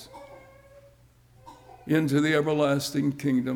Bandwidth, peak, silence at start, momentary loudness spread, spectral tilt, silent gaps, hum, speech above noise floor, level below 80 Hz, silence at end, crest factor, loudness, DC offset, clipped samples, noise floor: 19 kHz; -12 dBFS; 0 s; 22 LU; -6 dB/octave; none; none; 33 dB; -62 dBFS; 0 s; 16 dB; -25 LUFS; under 0.1%; under 0.1%; -57 dBFS